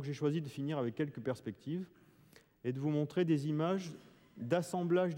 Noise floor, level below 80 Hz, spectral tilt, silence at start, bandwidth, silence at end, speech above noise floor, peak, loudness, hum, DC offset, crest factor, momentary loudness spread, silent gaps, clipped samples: -64 dBFS; -78 dBFS; -7.5 dB/octave; 0 s; 16.5 kHz; 0 s; 29 dB; -20 dBFS; -37 LUFS; none; under 0.1%; 16 dB; 10 LU; none; under 0.1%